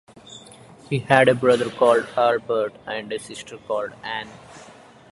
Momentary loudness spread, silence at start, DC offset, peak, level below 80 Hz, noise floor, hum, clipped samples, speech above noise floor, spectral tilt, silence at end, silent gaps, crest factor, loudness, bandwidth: 23 LU; 0.3 s; under 0.1%; 0 dBFS; -62 dBFS; -46 dBFS; none; under 0.1%; 24 dB; -5.5 dB/octave; 0.45 s; none; 22 dB; -21 LUFS; 11.5 kHz